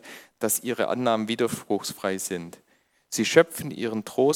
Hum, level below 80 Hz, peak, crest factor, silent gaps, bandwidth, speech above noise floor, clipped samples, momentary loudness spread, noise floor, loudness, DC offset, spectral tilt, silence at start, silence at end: none; -70 dBFS; -2 dBFS; 24 dB; none; 17.5 kHz; 28 dB; under 0.1%; 12 LU; -53 dBFS; -26 LUFS; under 0.1%; -3.5 dB/octave; 0.05 s; 0 s